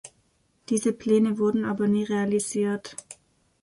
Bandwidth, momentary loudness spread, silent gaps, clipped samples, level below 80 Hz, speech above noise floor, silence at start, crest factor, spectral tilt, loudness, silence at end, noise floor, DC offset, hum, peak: 11.5 kHz; 9 LU; none; under 0.1%; -66 dBFS; 43 dB; 0.05 s; 16 dB; -5.5 dB/octave; -25 LUFS; 0.5 s; -67 dBFS; under 0.1%; none; -10 dBFS